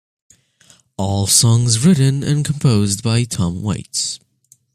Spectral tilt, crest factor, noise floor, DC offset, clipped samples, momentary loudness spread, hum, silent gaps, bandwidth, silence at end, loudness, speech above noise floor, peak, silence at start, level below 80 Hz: -4.5 dB/octave; 18 dB; -52 dBFS; under 0.1%; under 0.1%; 11 LU; none; none; 15 kHz; 0.6 s; -16 LUFS; 36 dB; 0 dBFS; 1 s; -48 dBFS